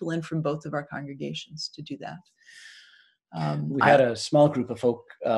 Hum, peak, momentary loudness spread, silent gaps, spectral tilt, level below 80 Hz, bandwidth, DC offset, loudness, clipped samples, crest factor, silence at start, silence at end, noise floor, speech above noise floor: none; -4 dBFS; 20 LU; none; -6 dB/octave; -68 dBFS; 11.5 kHz; under 0.1%; -25 LUFS; under 0.1%; 22 dB; 0 s; 0 s; -58 dBFS; 32 dB